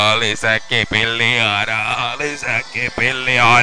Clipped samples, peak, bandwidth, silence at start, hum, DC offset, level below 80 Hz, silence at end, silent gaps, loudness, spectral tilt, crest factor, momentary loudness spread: under 0.1%; 0 dBFS; 10.5 kHz; 0 s; none; under 0.1%; -44 dBFS; 0 s; none; -16 LUFS; -3 dB/octave; 16 dB; 6 LU